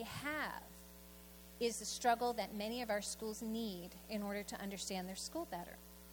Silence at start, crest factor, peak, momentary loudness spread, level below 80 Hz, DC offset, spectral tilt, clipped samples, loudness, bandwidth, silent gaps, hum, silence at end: 0 s; 22 dB; -22 dBFS; 18 LU; -64 dBFS; under 0.1%; -3.5 dB/octave; under 0.1%; -42 LUFS; 19.5 kHz; none; none; 0 s